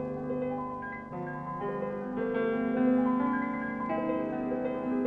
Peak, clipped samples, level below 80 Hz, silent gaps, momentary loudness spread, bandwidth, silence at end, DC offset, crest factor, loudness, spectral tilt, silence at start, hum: -18 dBFS; under 0.1%; -60 dBFS; none; 10 LU; 3.9 kHz; 0 s; under 0.1%; 14 dB; -32 LUFS; -9.5 dB/octave; 0 s; 50 Hz at -50 dBFS